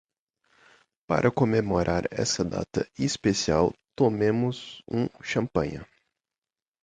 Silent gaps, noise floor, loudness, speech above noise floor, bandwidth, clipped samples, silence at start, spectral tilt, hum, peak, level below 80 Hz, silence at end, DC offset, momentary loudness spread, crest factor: none; under -90 dBFS; -26 LUFS; over 64 dB; 9.6 kHz; under 0.1%; 1.1 s; -5.5 dB/octave; none; -8 dBFS; -50 dBFS; 1 s; under 0.1%; 7 LU; 20 dB